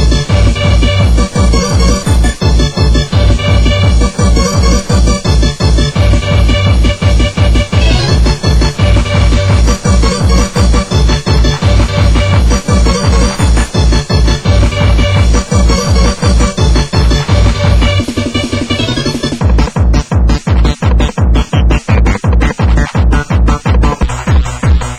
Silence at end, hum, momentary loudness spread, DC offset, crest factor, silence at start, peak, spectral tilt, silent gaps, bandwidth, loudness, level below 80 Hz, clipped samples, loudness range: 0 s; none; 2 LU; under 0.1%; 8 dB; 0 s; 0 dBFS; -5.5 dB/octave; none; 11.5 kHz; -10 LUFS; -10 dBFS; under 0.1%; 1 LU